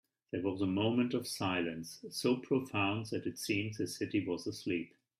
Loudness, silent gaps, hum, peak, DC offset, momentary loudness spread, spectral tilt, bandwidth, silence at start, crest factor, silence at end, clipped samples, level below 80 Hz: -36 LUFS; none; none; -20 dBFS; under 0.1%; 7 LU; -5 dB/octave; 15.5 kHz; 0.35 s; 16 dB; 0.3 s; under 0.1%; -74 dBFS